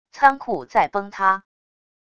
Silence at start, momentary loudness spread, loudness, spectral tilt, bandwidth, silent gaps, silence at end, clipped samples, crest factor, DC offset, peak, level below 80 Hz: 0.15 s; 8 LU; -21 LUFS; -5 dB/octave; 7.4 kHz; none; 0.75 s; under 0.1%; 22 dB; 0.4%; 0 dBFS; -60 dBFS